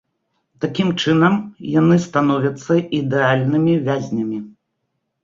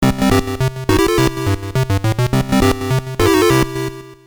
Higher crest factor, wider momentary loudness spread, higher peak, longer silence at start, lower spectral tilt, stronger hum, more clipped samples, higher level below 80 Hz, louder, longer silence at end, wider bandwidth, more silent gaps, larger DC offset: about the same, 16 dB vs 14 dB; about the same, 9 LU vs 7 LU; about the same, -2 dBFS vs -2 dBFS; first, 0.6 s vs 0 s; first, -7 dB/octave vs -5.5 dB/octave; neither; neither; second, -58 dBFS vs -30 dBFS; about the same, -18 LUFS vs -16 LUFS; first, 0.75 s vs 0.1 s; second, 7.6 kHz vs over 20 kHz; neither; neither